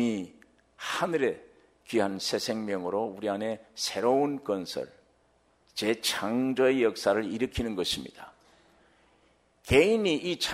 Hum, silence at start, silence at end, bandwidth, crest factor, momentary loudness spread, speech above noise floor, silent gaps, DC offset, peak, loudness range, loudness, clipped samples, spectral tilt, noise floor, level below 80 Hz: none; 0 s; 0 s; 16 kHz; 22 dB; 13 LU; 39 dB; none; under 0.1%; -8 dBFS; 3 LU; -29 LUFS; under 0.1%; -4 dB/octave; -67 dBFS; -54 dBFS